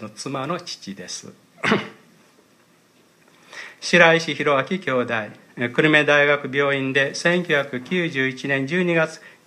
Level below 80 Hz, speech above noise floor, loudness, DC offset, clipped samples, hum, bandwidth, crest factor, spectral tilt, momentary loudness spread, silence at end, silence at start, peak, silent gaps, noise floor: -72 dBFS; 36 dB; -20 LUFS; under 0.1%; under 0.1%; none; 14 kHz; 22 dB; -4.5 dB/octave; 18 LU; 0.15 s; 0 s; 0 dBFS; none; -57 dBFS